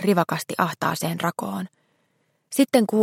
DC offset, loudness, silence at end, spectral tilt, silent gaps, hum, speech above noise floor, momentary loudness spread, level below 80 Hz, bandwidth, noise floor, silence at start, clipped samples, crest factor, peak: under 0.1%; -24 LUFS; 0 s; -5 dB/octave; none; none; 47 dB; 12 LU; -70 dBFS; 16.5 kHz; -69 dBFS; 0 s; under 0.1%; 20 dB; -4 dBFS